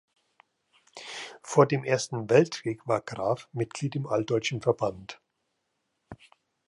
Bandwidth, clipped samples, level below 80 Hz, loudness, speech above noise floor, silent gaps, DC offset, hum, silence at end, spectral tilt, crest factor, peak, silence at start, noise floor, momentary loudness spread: 11.5 kHz; under 0.1%; -66 dBFS; -27 LUFS; 52 dB; none; under 0.1%; none; 0.55 s; -5.5 dB/octave; 22 dB; -6 dBFS; 0.95 s; -79 dBFS; 16 LU